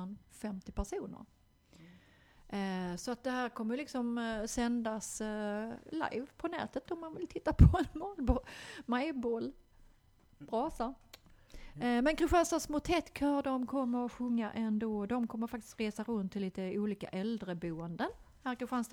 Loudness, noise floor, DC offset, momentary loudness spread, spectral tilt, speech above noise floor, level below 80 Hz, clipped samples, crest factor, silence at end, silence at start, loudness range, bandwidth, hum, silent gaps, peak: -36 LUFS; -65 dBFS; under 0.1%; 11 LU; -6 dB/octave; 31 dB; -44 dBFS; under 0.1%; 26 dB; 0.05 s; 0 s; 7 LU; 18 kHz; none; none; -10 dBFS